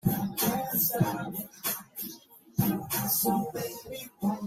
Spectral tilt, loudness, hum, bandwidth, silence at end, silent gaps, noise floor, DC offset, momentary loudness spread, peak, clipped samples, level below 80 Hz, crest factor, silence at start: -4.5 dB/octave; -30 LUFS; none; 16 kHz; 0 s; none; -50 dBFS; under 0.1%; 13 LU; -12 dBFS; under 0.1%; -60 dBFS; 18 dB; 0.05 s